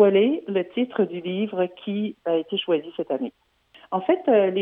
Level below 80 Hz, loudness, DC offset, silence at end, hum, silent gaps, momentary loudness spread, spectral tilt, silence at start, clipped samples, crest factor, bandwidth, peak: -74 dBFS; -24 LUFS; under 0.1%; 0 s; none; none; 9 LU; -9 dB/octave; 0 s; under 0.1%; 18 dB; 3.8 kHz; -6 dBFS